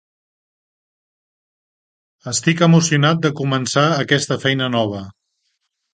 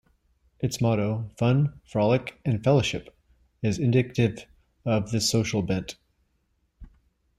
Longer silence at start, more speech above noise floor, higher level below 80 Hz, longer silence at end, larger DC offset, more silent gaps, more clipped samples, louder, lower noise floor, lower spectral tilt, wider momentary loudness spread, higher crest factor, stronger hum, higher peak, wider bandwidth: first, 2.25 s vs 0.6 s; first, 55 dB vs 47 dB; second, -58 dBFS vs -52 dBFS; first, 0.85 s vs 0.55 s; neither; neither; neither; first, -17 LUFS vs -26 LUFS; about the same, -71 dBFS vs -71 dBFS; second, -4.5 dB/octave vs -6 dB/octave; about the same, 10 LU vs 8 LU; about the same, 18 dB vs 18 dB; neither; first, 0 dBFS vs -8 dBFS; second, 9.6 kHz vs 15.5 kHz